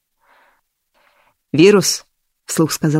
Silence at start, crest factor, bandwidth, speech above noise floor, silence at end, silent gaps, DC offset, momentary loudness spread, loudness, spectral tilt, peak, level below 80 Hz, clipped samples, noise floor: 1.55 s; 18 dB; 16 kHz; 50 dB; 0 s; none; under 0.1%; 13 LU; -15 LUFS; -4.5 dB/octave; 0 dBFS; -60 dBFS; under 0.1%; -63 dBFS